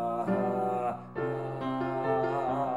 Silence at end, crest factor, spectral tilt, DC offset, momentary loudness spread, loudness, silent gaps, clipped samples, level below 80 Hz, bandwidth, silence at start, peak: 0 s; 14 dB; -8.5 dB/octave; 0.1%; 5 LU; -31 LUFS; none; under 0.1%; -66 dBFS; 13.5 kHz; 0 s; -16 dBFS